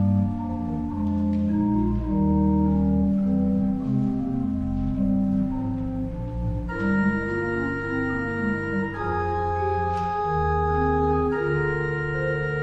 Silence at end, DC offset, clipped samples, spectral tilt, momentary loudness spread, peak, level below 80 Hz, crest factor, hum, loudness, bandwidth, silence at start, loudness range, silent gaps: 0 s; under 0.1%; under 0.1%; -9.5 dB/octave; 6 LU; -10 dBFS; -36 dBFS; 14 dB; none; -24 LUFS; 7.8 kHz; 0 s; 3 LU; none